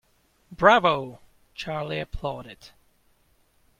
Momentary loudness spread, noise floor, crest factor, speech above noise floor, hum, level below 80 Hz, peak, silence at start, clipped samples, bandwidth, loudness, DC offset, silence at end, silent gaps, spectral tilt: 23 LU; -64 dBFS; 26 dB; 40 dB; none; -48 dBFS; -2 dBFS; 0.5 s; under 0.1%; 14 kHz; -23 LUFS; under 0.1%; 1.15 s; none; -5.5 dB/octave